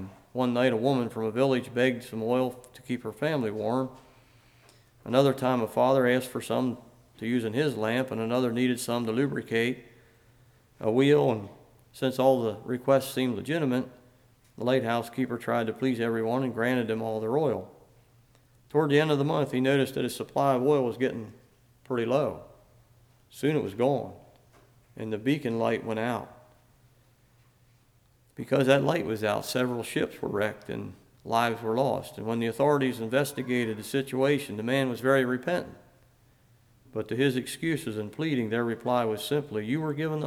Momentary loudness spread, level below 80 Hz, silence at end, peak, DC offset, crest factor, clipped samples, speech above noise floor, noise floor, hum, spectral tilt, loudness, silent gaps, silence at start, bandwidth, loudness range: 10 LU; -66 dBFS; 0 s; -8 dBFS; under 0.1%; 20 dB; under 0.1%; 36 dB; -63 dBFS; none; -6 dB/octave; -28 LUFS; none; 0 s; 17 kHz; 5 LU